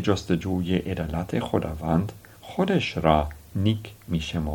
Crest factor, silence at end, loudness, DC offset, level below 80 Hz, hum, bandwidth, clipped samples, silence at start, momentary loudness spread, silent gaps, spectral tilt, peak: 22 dB; 0 s; -26 LUFS; under 0.1%; -42 dBFS; none; 18 kHz; under 0.1%; 0 s; 9 LU; none; -7 dB/octave; -4 dBFS